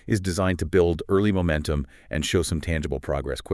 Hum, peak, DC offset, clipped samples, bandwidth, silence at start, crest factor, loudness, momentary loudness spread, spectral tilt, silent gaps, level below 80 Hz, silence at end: none; -8 dBFS; under 0.1%; under 0.1%; 12 kHz; 0.05 s; 16 dB; -25 LUFS; 7 LU; -5.5 dB/octave; none; -38 dBFS; 0 s